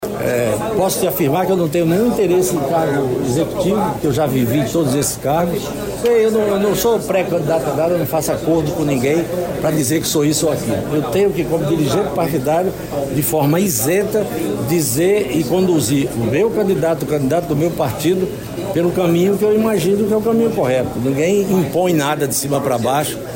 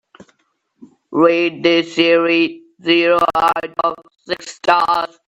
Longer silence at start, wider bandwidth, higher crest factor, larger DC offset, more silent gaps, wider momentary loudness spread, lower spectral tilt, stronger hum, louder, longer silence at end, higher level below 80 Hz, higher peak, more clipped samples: second, 0 s vs 0.8 s; first, 16.5 kHz vs 11 kHz; second, 10 dB vs 16 dB; neither; neither; second, 4 LU vs 12 LU; about the same, -5.5 dB/octave vs -4.5 dB/octave; neither; about the same, -16 LUFS vs -16 LUFS; second, 0 s vs 0.2 s; first, -42 dBFS vs -58 dBFS; second, -6 dBFS vs 0 dBFS; neither